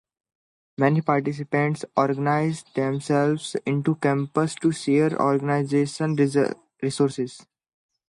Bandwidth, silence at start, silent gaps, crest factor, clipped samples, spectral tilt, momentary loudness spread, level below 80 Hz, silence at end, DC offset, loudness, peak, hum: 11.5 kHz; 0.8 s; none; 20 dB; under 0.1%; -6.5 dB/octave; 6 LU; -68 dBFS; 0.7 s; under 0.1%; -23 LUFS; -4 dBFS; none